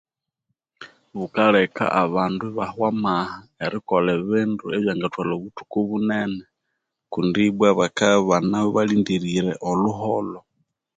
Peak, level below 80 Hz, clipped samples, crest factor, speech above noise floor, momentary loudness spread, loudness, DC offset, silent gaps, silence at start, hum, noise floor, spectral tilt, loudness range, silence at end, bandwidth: -4 dBFS; -58 dBFS; under 0.1%; 18 dB; 57 dB; 11 LU; -22 LUFS; under 0.1%; none; 0.8 s; none; -78 dBFS; -6 dB/octave; 4 LU; 0.6 s; 9.2 kHz